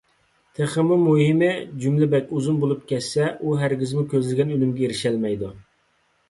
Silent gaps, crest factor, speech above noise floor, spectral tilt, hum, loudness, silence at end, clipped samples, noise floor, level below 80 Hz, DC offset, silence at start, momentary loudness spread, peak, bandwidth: none; 14 dB; 44 dB; -7 dB/octave; none; -22 LUFS; 0.7 s; under 0.1%; -65 dBFS; -58 dBFS; under 0.1%; 0.6 s; 8 LU; -8 dBFS; 11.5 kHz